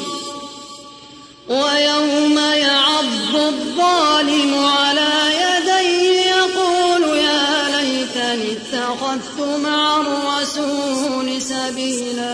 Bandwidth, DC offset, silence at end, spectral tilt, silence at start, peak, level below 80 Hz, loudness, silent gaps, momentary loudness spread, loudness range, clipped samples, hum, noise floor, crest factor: 11 kHz; under 0.1%; 0 s; -1.5 dB/octave; 0 s; -4 dBFS; -60 dBFS; -16 LUFS; none; 9 LU; 5 LU; under 0.1%; none; -40 dBFS; 14 dB